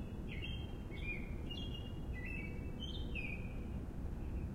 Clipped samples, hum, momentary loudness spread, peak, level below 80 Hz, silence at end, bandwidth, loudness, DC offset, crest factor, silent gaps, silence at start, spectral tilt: under 0.1%; none; 3 LU; -30 dBFS; -46 dBFS; 0 s; 15.5 kHz; -45 LUFS; under 0.1%; 12 dB; none; 0 s; -6.5 dB/octave